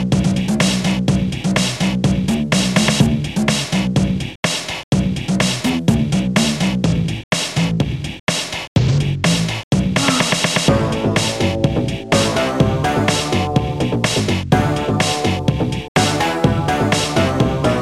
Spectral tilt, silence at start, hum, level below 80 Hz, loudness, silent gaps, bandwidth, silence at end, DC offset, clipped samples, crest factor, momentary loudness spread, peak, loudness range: -5 dB/octave; 0 s; none; -34 dBFS; -17 LUFS; 4.36-4.43 s, 4.83-4.92 s, 7.24-7.31 s, 8.20-8.27 s, 8.68-8.76 s, 9.64-9.71 s, 15.88-15.95 s; 14.5 kHz; 0 s; 0.3%; under 0.1%; 16 dB; 5 LU; 0 dBFS; 2 LU